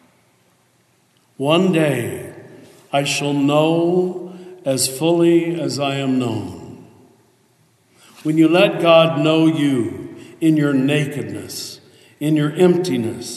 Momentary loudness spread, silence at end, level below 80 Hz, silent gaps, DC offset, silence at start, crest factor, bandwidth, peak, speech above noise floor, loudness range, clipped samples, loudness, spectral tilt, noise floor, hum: 15 LU; 0 s; -68 dBFS; none; under 0.1%; 1.4 s; 18 dB; 13 kHz; -2 dBFS; 43 dB; 5 LU; under 0.1%; -17 LUFS; -5.5 dB/octave; -59 dBFS; none